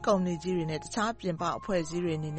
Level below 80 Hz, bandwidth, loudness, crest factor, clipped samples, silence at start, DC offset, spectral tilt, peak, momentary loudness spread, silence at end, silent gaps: -54 dBFS; 8.8 kHz; -31 LUFS; 16 dB; under 0.1%; 0 s; under 0.1%; -6 dB/octave; -14 dBFS; 4 LU; 0 s; none